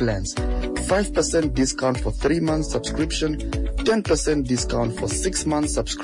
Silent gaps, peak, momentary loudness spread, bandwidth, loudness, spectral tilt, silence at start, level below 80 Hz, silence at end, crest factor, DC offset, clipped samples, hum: none; -10 dBFS; 5 LU; 11 kHz; -23 LUFS; -4.5 dB/octave; 0 s; -30 dBFS; 0 s; 12 dB; under 0.1%; under 0.1%; none